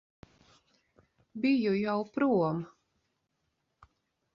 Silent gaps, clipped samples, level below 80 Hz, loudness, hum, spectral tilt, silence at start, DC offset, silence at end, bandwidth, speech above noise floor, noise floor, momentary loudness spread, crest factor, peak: none; under 0.1%; -70 dBFS; -30 LUFS; none; -8.5 dB/octave; 1.35 s; under 0.1%; 1.7 s; 6.4 kHz; 51 dB; -80 dBFS; 15 LU; 18 dB; -16 dBFS